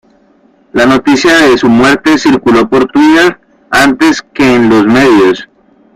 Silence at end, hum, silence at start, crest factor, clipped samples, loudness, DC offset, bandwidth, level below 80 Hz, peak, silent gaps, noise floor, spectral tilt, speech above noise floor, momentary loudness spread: 0.5 s; none; 0.75 s; 8 dB; 0.1%; -7 LUFS; under 0.1%; 15.5 kHz; -40 dBFS; 0 dBFS; none; -46 dBFS; -4.5 dB/octave; 40 dB; 5 LU